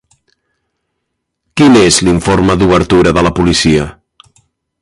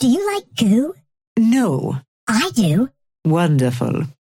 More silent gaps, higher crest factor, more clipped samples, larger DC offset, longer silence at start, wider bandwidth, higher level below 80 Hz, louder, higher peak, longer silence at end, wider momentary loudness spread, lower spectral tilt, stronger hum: second, none vs 1.27-1.36 s, 2.08-2.27 s; about the same, 12 dB vs 12 dB; neither; neither; first, 1.55 s vs 0 s; second, 11.5 kHz vs 17 kHz; first, -30 dBFS vs -56 dBFS; first, -9 LUFS vs -18 LUFS; first, 0 dBFS vs -4 dBFS; first, 0.9 s vs 0.25 s; second, 6 LU vs 9 LU; about the same, -5 dB/octave vs -6 dB/octave; neither